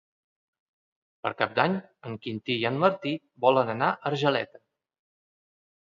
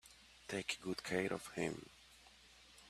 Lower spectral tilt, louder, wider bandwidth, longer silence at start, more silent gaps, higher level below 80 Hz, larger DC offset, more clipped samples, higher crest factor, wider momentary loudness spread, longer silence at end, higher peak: first, -6.5 dB/octave vs -4 dB/octave; first, -27 LUFS vs -42 LUFS; second, 7.4 kHz vs 14.5 kHz; first, 1.25 s vs 0.05 s; neither; about the same, -72 dBFS vs -72 dBFS; neither; neither; about the same, 24 dB vs 24 dB; second, 11 LU vs 22 LU; first, 1.4 s vs 0 s; first, -6 dBFS vs -22 dBFS